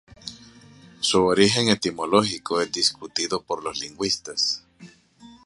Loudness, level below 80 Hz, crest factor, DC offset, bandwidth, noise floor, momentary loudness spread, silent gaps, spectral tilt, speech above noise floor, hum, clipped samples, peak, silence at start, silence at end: -22 LUFS; -56 dBFS; 22 dB; under 0.1%; 11.5 kHz; -50 dBFS; 12 LU; none; -3 dB/octave; 27 dB; none; under 0.1%; -2 dBFS; 0.25 s; 0.1 s